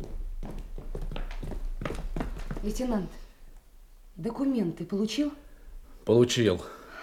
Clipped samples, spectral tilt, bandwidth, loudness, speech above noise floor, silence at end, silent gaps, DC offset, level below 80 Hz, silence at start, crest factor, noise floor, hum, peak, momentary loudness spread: under 0.1%; -5.5 dB/octave; 16 kHz; -30 LUFS; 24 dB; 0 s; none; under 0.1%; -38 dBFS; 0 s; 22 dB; -51 dBFS; none; -10 dBFS; 19 LU